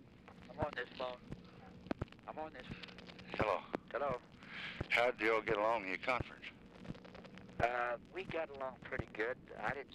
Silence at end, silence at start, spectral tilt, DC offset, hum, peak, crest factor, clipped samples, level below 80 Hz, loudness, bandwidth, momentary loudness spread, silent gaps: 0 s; 0 s; -5.5 dB/octave; under 0.1%; none; -22 dBFS; 18 dB; under 0.1%; -62 dBFS; -40 LUFS; 14.5 kHz; 19 LU; none